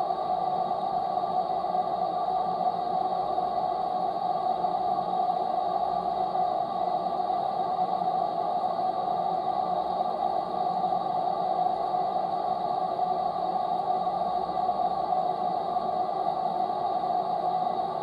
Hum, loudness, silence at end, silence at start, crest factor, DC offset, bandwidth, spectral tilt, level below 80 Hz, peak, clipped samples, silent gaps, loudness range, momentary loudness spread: none; -28 LUFS; 0 s; 0 s; 12 dB; under 0.1%; 8.4 kHz; -7 dB/octave; -64 dBFS; -16 dBFS; under 0.1%; none; 0 LU; 1 LU